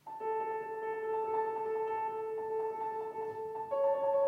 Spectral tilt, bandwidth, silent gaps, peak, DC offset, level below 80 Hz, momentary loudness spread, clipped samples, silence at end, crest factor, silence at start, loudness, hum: -6 dB/octave; 5.8 kHz; none; -22 dBFS; under 0.1%; -84 dBFS; 7 LU; under 0.1%; 0 s; 12 dB; 0.05 s; -36 LUFS; none